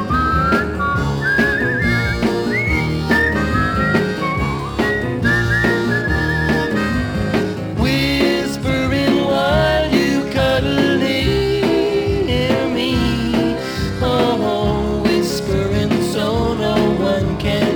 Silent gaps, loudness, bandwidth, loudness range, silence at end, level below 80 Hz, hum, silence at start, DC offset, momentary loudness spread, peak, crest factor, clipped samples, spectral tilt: none; -17 LUFS; over 20 kHz; 2 LU; 0 s; -30 dBFS; none; 0 s; under 0.1%; 4 LU; -2 dBFS; 16 dB; under 0.1%; -6 dB/octave